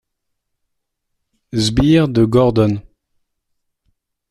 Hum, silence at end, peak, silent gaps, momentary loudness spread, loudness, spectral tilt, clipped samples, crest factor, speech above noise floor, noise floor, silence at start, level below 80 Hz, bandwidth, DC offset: none; 1.5 s; -2 dBFS; none; 9 LU; -14 LUFS; -6.5 dB/octave; under 0.1%; 16 dB; 61 dB; -74 dBFS; 1.55 s; -38 dBFS; 12.5 kHz; under 0.1%